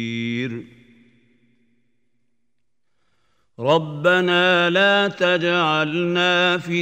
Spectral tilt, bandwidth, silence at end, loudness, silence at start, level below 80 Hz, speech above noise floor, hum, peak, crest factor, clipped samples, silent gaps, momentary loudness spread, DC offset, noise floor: -5 dB/octave; 15.5 kHz; 0 s; -18 LUFS; 0 s; -70 dBFS; 59 dB; none; -4 dBFS; 18 dB; under 0.1%; none; 10 LU; under 0.1%; -78 dBFS